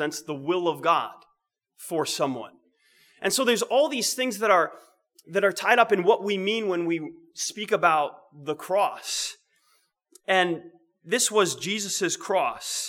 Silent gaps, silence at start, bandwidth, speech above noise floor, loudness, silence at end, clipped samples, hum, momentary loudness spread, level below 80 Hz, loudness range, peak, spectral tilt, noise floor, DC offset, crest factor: none; 0 s; 19 kHz; 48 dB; -25 LUFS; 0 s; under 0.1%; none; 11 LU; -80 dBFS; 4 LU; -4 dBFS; -2.5 dB/octave; -73 dBFS; under 0.1%; 22 dB